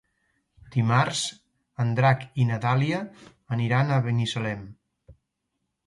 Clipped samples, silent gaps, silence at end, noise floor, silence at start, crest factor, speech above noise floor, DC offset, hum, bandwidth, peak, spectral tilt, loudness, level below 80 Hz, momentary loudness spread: under 0.1%; none; 0.75 s; -79 dBFS; 0.7 s; 20 dB; 55 dB; under 0.1%; none; 11.5 kHz; -6 dBFS; -5.5 dB/octave; -25 LUFS; -60 dBFS; 10 LU